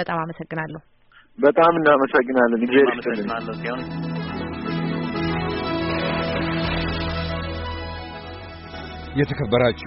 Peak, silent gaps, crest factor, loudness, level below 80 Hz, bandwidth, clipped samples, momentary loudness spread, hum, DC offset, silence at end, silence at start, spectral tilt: -4 dBFS; none; 18 dB; -22 LUFS; -40 dBFS; 5.8 kHz; under 0.1%; 17 LU; none; under 0.1%; 0 s; 0 s; -4.5 dB/octave